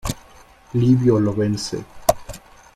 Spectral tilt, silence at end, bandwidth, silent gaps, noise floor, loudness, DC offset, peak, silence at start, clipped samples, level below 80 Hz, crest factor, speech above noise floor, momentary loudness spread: -6.5 dB/octave; 0.35 s; 16 kHz; none; -47 dBFS; -20 LUFS; under 0.1%; 0 dBFS; 0.05 s; under 0.1%; -42 dBFS; 20 dB; 30 dB; 18 LU